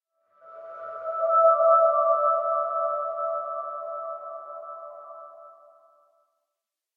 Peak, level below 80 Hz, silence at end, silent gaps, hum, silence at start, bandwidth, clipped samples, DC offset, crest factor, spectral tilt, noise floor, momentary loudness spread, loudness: -8 dBFS; under -90 dBFS; 1.45 s; none; none; 0.45 s; 2.4 kHz; under 0.1%; under 0.1%; 18 dB; -5.5 dB/octave; -86 dBFS; 23 LU; -23 LUFS